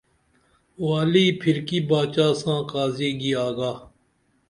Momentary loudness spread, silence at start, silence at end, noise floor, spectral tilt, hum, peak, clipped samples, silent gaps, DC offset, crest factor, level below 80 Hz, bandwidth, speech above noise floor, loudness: 9 LU; 0.8 s; 0.6 s; -66 dBFS; -6 dB/octave; none; -6 dBFS; under 0.1%; none; under 0.1%; 18 dB; -60 dBFS; 11.5 kHz; 44 dB; -23 LUFS